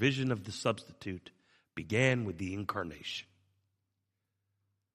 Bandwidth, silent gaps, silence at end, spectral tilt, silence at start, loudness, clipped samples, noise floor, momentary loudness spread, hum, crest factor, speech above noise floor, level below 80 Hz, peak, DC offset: 14.5 kHz; none; 1.75 s; -5.5 dB/octave; 0 s; -35 LUFS; under 0.1%; -84 dBFS; 14 LU; none; 24 dB; 50 dB; -70 dBFS; -12 dBFS; under 0.1%